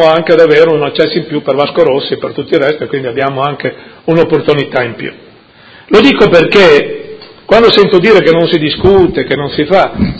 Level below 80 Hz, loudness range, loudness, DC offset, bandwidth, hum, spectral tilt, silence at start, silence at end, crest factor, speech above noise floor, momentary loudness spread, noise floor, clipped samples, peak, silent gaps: -36 dBFS; 6 LU; -9 LUFS; under 0.1%; 8 kHz; none; -6.5 dB/octave; 0 s; 0 s; 8 dB; 30 dB; 12 LU; -38 dBFS; 2%; 0 dBFS; none